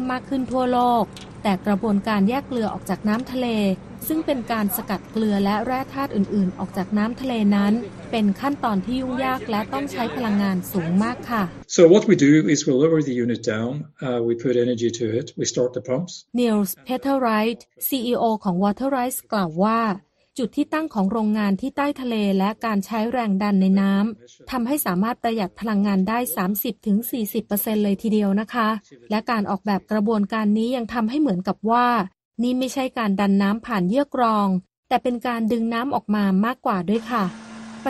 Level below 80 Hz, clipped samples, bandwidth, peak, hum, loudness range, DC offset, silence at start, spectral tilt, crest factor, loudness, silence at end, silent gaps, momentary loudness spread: -54 dBFS; under 0.1%; 13 kHz; -2 dBFS; none; 5 LU; under 0.1%; 0 s; -6 dB/octave; 20 dB; -22 LUFS; 0 s; 32.25-32.31 s, 34.77-34.83 s; 7 LU